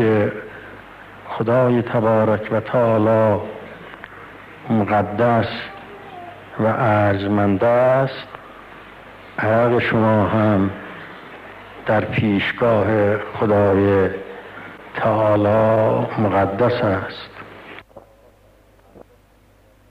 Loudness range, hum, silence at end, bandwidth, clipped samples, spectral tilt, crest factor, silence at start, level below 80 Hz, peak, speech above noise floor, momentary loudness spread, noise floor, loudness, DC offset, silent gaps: 4 LU; none; 1.9 s; 5.6 kHz; under 0.1%; -9 dB/octave; 12 dB; 0 s; -52 dBFS; -8 dBFS; 36 dB; 22 LU; -53 dBFS; -18 LUFS; under 0.1%; none